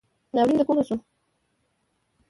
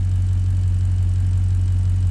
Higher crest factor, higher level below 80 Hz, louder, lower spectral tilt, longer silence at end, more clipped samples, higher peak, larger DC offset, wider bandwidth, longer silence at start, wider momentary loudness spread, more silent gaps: first, 18 dB vs 6 dB; second, -62 dBFS vs -26 dBFS; second, -24 LUFS vs -20 LUFS; about the same, -7 dB/octave vs -8 dB/octave; first, 1.3 s vs 0 s; neither; about the same, -10 dBFS vs -12 dBFS; neither; first, 11.5 kHz vs 8.8 kHz; first, 0.35 s vs 0 s; first, 9 LU vs 1 LU; neither